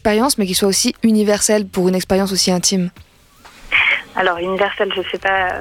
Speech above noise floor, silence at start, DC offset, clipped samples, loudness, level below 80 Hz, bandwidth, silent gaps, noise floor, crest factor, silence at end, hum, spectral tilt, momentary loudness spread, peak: 29 dB; 0.05 s; under 0.1%; under 0.1%; -16 LUFS; -44 dBFS; 17 kHz; none; -45 dBFS; 16 dB; 0 s; none; -3.5 dB/octave; 5 LU; 0 dBFS